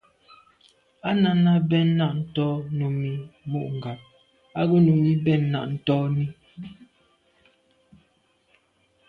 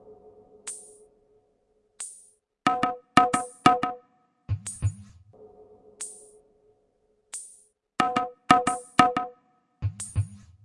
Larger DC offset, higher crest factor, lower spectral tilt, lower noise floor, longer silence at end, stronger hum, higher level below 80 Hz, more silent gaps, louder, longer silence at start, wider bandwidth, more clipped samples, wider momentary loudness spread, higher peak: neither; second, 16 dB vs 28 dB; first, -10 dB/octave vs -4.5 dB/octave; about the same, -66 dBFS vs -69 dBFS; first, 2.25 s vs 0.25 s; neither; second, -62 dBFS vs -56 dBFS; neither; first, -23 LUFS vs -26 LUFS; first, 1.05 s vs 0.1 s; second, 4.7 kHz vs 11.5 kHz; neither; about the same, 17 LU vs 18 LU; second, -10 dBFS vs -2 dBFS